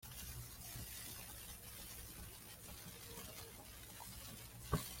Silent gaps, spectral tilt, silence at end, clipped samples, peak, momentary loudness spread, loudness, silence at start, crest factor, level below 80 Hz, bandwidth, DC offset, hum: none; -3.5 dB/octave; 0 s; under 0.1%; -22 dBFS; 8 LU; -50 LUFS; 0 s; 28 dB; -60 dBFS; 16.5 kHz; under 0.1%; none